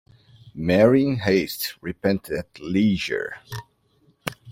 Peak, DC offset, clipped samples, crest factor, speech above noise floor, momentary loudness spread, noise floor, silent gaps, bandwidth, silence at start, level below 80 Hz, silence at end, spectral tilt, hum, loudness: -2 dBFS; under 0.1%; under 0.1%; 20 dB; 40 dB; 18 LU; -62 dBFS; none; 16.5 kHz; 0.45 s; -54 dBFS; 0 s; -6 dB/octave; none; -22 LUFS